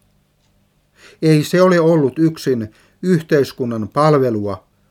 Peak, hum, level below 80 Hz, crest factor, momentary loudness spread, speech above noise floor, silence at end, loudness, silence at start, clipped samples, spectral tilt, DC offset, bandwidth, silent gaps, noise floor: -2 dBFS; none; -60 dBFS; 16 dB; 11 LU; 44 dB; 0.35 s; -16 LUFS; 1.2 s; under 0.1%; -7 dB/octave; under 0.1%; 16 kHz; none; -59 dBFS